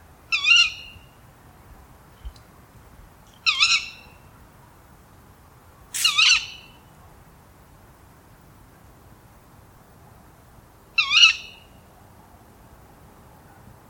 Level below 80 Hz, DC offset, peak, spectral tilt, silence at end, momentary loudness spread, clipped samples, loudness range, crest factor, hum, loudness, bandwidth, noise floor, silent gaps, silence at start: -54 dBFS; under 0.1%; -2 dBFS; 1.5 dB/octave; 2.4 s; 24 LU; under 0.1%; 4 LU; 26 dB; none; -17 LUFS; 19 kHz; -50 dBFS; none; 0.3 s